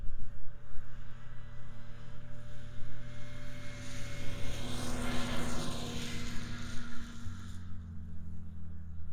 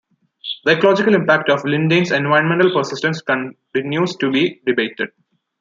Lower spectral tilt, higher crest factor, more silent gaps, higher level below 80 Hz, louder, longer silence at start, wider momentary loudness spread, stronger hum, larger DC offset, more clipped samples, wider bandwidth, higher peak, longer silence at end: second, -4.5 dB/octave vs -6 dB/octave; about the same, 12 dB vs 16 dB; neither; first, -44 dBFS vs -64 dBFS; second, -44 LUFS vs -17 LUFS; second, 0 s vs 0.45 s; first, 14 LU vs 10 LU; neither; neither; neither; first, 13.5 kHz vs 7.6 kHz; second, -18 dBFS vs -2 dBFS; second, 0 s vs 0.55 s